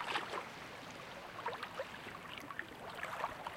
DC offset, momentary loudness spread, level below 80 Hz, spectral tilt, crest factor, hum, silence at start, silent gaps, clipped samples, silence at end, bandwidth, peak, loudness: under 0.1%; 8 LU; -72 dBFS; -3 dB/octave; 22 dB; none; 0 s; none; under 0.1%; 0 s; 16.5 kHz; -24 dBFS; -45 LUFS